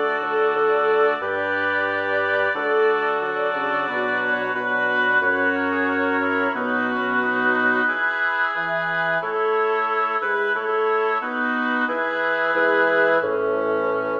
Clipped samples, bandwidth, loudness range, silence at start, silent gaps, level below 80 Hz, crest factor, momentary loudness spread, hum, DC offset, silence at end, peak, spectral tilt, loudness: under 0.1%; 6.8 kHz; 1 LU; 0 s; none; -70 dBFS; 14 dB; 4 LU; none; under 0.1%; 0 s; -6 dBFS; -6 dB/octave; -21 LUFS